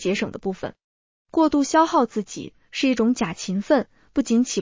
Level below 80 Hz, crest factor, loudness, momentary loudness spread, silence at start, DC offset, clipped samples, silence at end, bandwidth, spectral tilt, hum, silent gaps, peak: -56 dBFS; 18 dB; -22 LUFS; 14 LU; 0 s; under 0.1%; under 0.1%; 0 s; 7.6 kHz; -4.5 dB/octave; none; 0.84-1.25 s; -6 dBFS